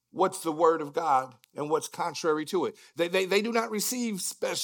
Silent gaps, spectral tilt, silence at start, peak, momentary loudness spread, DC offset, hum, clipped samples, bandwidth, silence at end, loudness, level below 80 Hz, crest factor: none; -3.5 dB/octave; 0.15 s; -10 dBFS; 7 LU; under 0.1%; none; under 0.1%; 18 kHz; 0 s; -28 LUFS; -88 dBFS; 20 dB